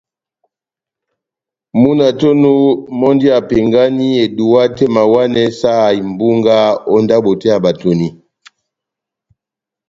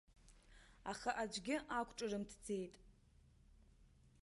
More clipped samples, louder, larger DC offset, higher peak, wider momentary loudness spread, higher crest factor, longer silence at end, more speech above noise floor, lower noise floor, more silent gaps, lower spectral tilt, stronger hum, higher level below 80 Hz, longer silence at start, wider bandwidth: neither; first, -12 LUFS vs -45 LUFS; neither; first, 0 dBFS vs -28 dBFS; second, 4 LU vs 8 LU; second, 12 dB vs 20 dB; first, 1.75 s vs 0.15 s; first, 76 dB vs 25 dB; first, -86 dBFS vs -69 dBFS; neither; first, -7 dB/octave vs -4 dB/octave; neither; first, -48 dBFS vs -68 dBFS; first, 1.75 s vs 0.1 s; second, 7.6 kHz vs 11.5 kHz